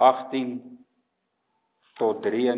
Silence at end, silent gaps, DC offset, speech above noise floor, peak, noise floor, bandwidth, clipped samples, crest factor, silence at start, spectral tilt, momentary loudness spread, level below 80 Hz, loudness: 0 s; none; under 0.1%; 53 dB; -4 dBFS; -76 dBFS; 4 kHz; under 0.1%; 22 dB; 0 s; -9 dB/octave; 11 LU; -82 dBFS; -26 LUFS